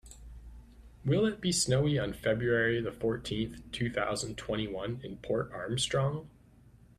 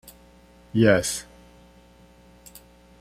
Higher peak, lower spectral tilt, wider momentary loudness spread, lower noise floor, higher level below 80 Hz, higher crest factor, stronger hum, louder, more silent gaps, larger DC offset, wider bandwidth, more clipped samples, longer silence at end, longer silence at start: second, -16 dBFS vs -4 dBFS; about the same, -4.5 dB/octave vs -5 dB/octave; second, 11 LU vs 28 LU; first, -58 dBFS vs -53 dBFS; about the same, -54 dBFS vs -52 dBFS; second, 18 dB vs 24 dB; second, none vs 60 Hz at -50 dBFS; second, -32 LUFS vs -22 LUFS; neither; neither; second, 14.5 kHz vs 16 kHz; neither; second, 0.7 s vs 1.8 s; second, 0.05 s vs 0.75 s